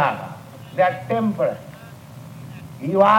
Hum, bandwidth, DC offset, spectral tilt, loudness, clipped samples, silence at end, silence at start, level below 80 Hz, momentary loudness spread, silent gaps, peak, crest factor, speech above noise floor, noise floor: none; 16.5 kHz; under 0.1%; -7 dB/octave; -22 LUFS; under 0.1%; 0 s; 0 s; -62 dBFS; 20 LU; none; -2 dBFS; 20 dB; 22 dB; -40 dBFS